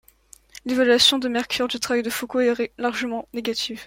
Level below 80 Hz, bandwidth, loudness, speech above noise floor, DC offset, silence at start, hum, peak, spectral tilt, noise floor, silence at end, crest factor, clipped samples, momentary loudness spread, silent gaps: -58 dBFS; 16.5 kHz; -21 LUFS; 30 dB; under 0.1%; 0.65 s; none; -4 dBFS; -2 dB/octave; -53 dBFS; 0 s; 18 dB; under 0.1%; 12 LU; none